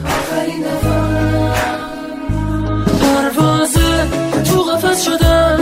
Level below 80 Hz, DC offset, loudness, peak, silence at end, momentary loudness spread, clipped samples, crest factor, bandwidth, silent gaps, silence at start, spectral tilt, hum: -24 dBFS; under 0.1%; -15 LUFS; 0 dBFS; 0 s; 8 LU; under 0.1%; 14 dB; 16 kHz; none; 0 s; -5 dB/octave; none